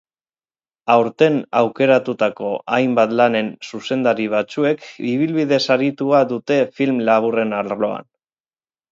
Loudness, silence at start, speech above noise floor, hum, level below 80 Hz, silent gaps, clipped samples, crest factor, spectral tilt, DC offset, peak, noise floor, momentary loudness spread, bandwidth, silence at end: -18 LUFS; 0.85 s; over 73 dB; none; -68 dBFS; none; under 0.1%; 18 dB; -6 dB/octave; under 0.1%; 0 dBFS; under -90 dBFS; 8 LU; 7.6 kHz; 0.9 s